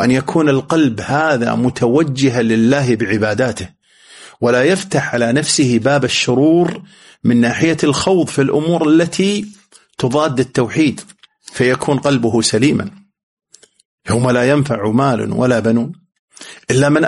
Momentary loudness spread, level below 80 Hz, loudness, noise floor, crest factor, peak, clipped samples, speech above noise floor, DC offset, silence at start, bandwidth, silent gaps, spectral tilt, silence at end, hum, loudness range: 8 LU; -50 dBFS; -15 LUFS; -42 dBFS; 14 dB; 0 dBFS; under 0.1%; 28 dB; under 0.1%; 0 s; 11.5 kHz; 13.23-13.37 s, 13.85-13.98 s, 16.19-16.28 s; -5.5 dB/octave; 0 s; none; 3 LU